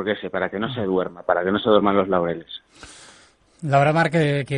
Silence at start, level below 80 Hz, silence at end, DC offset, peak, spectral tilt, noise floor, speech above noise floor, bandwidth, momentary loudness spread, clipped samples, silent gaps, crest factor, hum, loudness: 0 s; -56 dBFS; 0 s; under 0.1%; -2 dBFS; -7 dB/octave; -53 dBFS; 32 dB; 10.5 kHz; 13 LU; under 0.1%; none; 20 dB; none; -21 LUFS